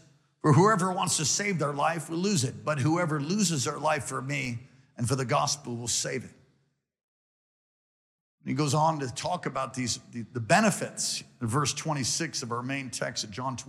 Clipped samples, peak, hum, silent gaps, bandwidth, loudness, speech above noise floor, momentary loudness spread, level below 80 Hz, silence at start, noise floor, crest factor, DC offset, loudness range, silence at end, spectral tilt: under 0.1%; -10 dBFS; none; 7.03-8.38 s; 15 kHz; -28 LUFS; 45 dB; 10 LU; -68 dBFS; 0.45 s; -73 dBFS; 20 dB; under 0.1%; 7 LU; 0 s; -4 dB/octave